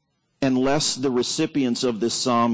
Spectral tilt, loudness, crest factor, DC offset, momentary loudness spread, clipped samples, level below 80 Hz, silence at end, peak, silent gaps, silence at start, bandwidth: -4 dB/octave; -22 LUFS; 12 dB; under 0.1%; 3 LU; under 0.1%; -58 dBFS; 0 s; -10 dBFS; none; 0.4 s; 8 kHz